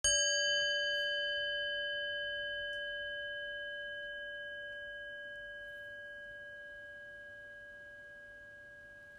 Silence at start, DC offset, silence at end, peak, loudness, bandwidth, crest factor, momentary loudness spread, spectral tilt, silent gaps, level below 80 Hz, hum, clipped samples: 0.05 s; under 0.1%; 0 s; -18 dBFS; -36 LUFS; 14 kHz; 22 dB; 20 LU; 1.5 dB/octave; none; -66 dBFS; none; under 0.1%